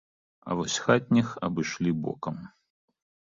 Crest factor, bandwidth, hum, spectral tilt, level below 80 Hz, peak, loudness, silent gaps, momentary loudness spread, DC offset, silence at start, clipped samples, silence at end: 22 dB; 7.8 kHz; none; -5 dB/octave; -60 dBFS; -6 dBFS; -28 LUFS; none; 13 LU; under 0.1%; 0.45 s; under 0.1%; 0.75 s